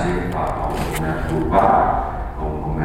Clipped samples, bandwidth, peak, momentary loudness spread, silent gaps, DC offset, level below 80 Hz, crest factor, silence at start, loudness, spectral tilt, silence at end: under 0.1%; 16.5 kHz; 0 dBFS; 11 LU; none; under 0.1%; -28 dBFS; 18 dB; 0 s; -20 LUFS; -7 dB/octave; 0 s